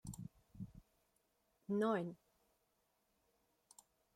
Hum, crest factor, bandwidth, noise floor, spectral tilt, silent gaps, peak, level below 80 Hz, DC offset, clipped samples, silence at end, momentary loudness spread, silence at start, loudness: none; 20 dB; 16 kHz; -82 dBFS; -6.5 dB/octave; none; -28 dBFS; -72 dBFS; under 0.1%; under 0.1%; 2 s; 21 LU; 0.05 s; -42 LUFS